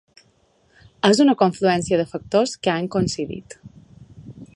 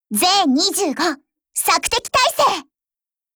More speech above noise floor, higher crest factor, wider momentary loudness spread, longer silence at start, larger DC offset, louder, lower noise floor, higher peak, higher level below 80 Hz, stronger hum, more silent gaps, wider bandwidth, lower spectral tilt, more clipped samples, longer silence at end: second, 41 dB vs over 73 dB; first, 22 dB vs 16 dB; first, 14 LU vs 10 LU; first, 1.05 s vs 0.1 s; neither; second, -20 LUFS vs -17 LUFS; second, -61 dBFS vs under -90 dBFS; about the same, 0 dBFS vs -2 dBFS; about the same, -52 dBFS vs -52 dBFS; neither; neither; second, 11.5 kHz vs over 20 kHz; first, -5 dB/octave vs -1.5 dB/octave; neither; second, 0.1 s vs 0.75 s